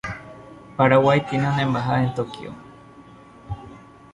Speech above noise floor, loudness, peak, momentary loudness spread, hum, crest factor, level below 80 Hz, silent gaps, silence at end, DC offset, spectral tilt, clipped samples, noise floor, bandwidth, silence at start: 26 dB; -20 LUFS; -4 dBFS; 22 LU; none; 20 dB; -50 dBFS; none; 0.35 s; under 0.1%; -7.5 dB/octave; under 0.1%; -46 dBFS; 11 kHz; 0.05 s